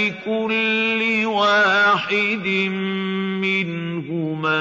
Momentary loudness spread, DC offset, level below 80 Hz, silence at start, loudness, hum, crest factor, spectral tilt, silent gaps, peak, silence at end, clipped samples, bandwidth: 10 LU; under 0.1%; -68 dBFS; 0 s; -19 LUFS; none; 14 dB; -5.5 dB/octave; none; -6 dBFS; 0 s; under 0.1%; 7.8 kHz